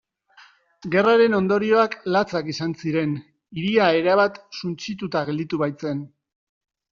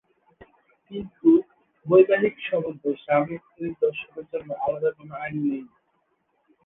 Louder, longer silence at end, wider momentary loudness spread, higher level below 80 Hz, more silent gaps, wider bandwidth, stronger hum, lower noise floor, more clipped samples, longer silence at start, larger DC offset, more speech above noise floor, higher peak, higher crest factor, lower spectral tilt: about the same, -22 LUFS vs -24 LUFS; second, 0.85 s vs 1 s; second, 13 LU vs 16 LU; about the same, -64 dBFS vs -64 dBFS; neither; first, 7.2 kHz vs 3.9 kHz; neither; second, -53 dBFS vs -71 dBFS; neither; about the same, 0.85 s vs 0.9 s; neither; second, 32 dB vs 47 dB; about the same, -4 dBFS vs -4 dBFS; about the same, 18 dB vs 20 dB; second, -4.5 dB/octave vs -10 dB/octave